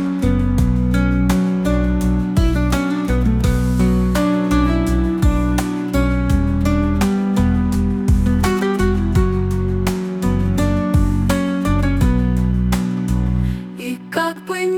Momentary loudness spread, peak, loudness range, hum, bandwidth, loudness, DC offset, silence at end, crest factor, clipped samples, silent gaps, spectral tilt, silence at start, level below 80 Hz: 4 LU; -2 dBFS; 1 LU; none; 17.5 kHz; -18 LUFS; under 0.1%; 0 s; 14 dB; under 0.1%; none; -7 dB/octave; 0 s; -22 dBFS